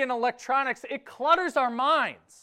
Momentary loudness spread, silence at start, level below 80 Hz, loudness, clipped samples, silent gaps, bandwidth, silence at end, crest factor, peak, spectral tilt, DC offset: 9 LU; 0 s; -70 dBFS; -26 LUFS; under 0.1%; none; 14 kHz; 0.3 s; 18 dB; -8 dBFS; -3 dB/octave; under 0.1%